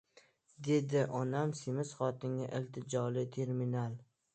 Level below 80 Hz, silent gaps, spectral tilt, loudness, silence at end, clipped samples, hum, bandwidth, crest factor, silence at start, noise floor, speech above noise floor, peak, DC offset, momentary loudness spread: -78 dBFS; none; -7 dB/octave; -37 LUFS; 0.3 s; under 0.1%; none; 9 kHz; 16 dB; 0.6 s; -67 dBFS; 31 dB; -20 dBFS; under 0.1%; 7 LU